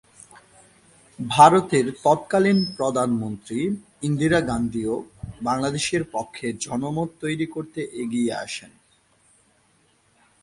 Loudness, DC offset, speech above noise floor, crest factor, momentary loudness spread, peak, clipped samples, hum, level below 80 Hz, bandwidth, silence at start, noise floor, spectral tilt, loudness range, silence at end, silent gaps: -23 LUFS; under 0.1%; 40 dB; 22 dB; 12 LU; -2 dBFS; under 0.1%; none; -54 dBFS; 11.5 kHz; 1.2 s; -62 dBFS; -5 dB/octave; 9 LU; 1.75 s; none